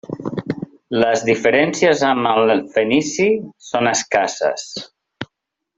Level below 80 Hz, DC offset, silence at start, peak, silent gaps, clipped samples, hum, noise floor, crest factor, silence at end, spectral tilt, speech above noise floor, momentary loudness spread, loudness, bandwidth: -58 dBFS; under 0.1%; 0.1 s; 0 dBFS; none; under 0.1%; none; -76 dBFS; 18 dB; 0.55 s; -4 dB/octave; 59 dB; 15 LU; -17 LUFS; 8 kHz